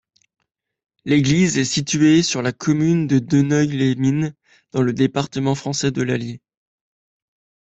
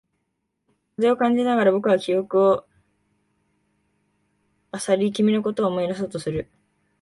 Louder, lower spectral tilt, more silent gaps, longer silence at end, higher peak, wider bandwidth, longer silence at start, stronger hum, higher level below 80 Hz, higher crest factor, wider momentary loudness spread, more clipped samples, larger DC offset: first, -19 LUFS vs -22 LUFS; about the same, -5.5 dB/octave vs -6 dB/octave; neither; first, 1.3 s vs 0.6 s; about the same, -4 dBFS vs -6 dBFS; second, 8.4 kHz vs 11.5 kHz; about the same, 1.05 s vs 1 s; neither; first, -54 dBFS vs -60 dBFS; about the same, 16 dB vs 18 dB; second, 9 LU vs 12 LU; neither; neither